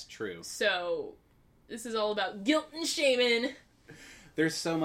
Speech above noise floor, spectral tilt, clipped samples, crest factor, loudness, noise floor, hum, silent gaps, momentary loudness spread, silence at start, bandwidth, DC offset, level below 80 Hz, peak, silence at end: 22 dB; -3 dB/octave; under 0.1%; 20 dB; -30 LUFS; -53 dBFS; none; none; 17 LU; 0 s; 16 kHz; under 0.1%; -68 dBFS; -12 dBFS; 0 s